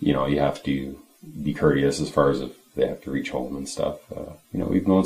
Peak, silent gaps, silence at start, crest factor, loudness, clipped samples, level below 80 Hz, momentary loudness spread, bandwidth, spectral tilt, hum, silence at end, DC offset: -6 dBFS; none; 0 s; 20 dB; -25 LUFS; under 0.1%; -46 dBFS; 16 LU; 15.5 kHz; -6.5 dB/octave; none; 0 s; under 0.1%